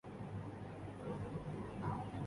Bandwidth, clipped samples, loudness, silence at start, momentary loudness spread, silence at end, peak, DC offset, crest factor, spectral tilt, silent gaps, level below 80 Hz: 11.5 kHz; under 0.1%; -46 LUFS; 0.05 s; 6 LU; 0 s; -30 dBFS; under 0.1%; 16 dB; -8 dB/octave; none; -60 dBFS